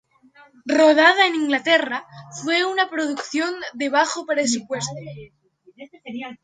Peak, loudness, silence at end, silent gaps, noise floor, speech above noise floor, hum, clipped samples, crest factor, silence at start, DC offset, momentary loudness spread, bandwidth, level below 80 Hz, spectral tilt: -4 dBFS; -19 LUFS; 0.1 s; none; -53 dBFS; 32 dB; none; under 0.1%; 18 dB; 0.65 s; under 0.1%; 21 LU; 9.6 kHz; -68 dBFS; -3 dB/octave